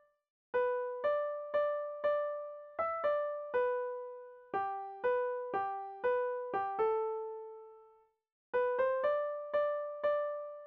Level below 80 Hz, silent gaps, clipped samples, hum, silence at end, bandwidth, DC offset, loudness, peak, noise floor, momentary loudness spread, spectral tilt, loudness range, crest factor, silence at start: -78 dBFS; 8.32-8.53 s; under 0.1%; none; 0 s; 4.4 kHz; under 0.1%; -35 LUFS; -22 dBFS; -66 dBFS; 8 LU; -6 dB/octave; 2 LU; 14 dB; 0.55 s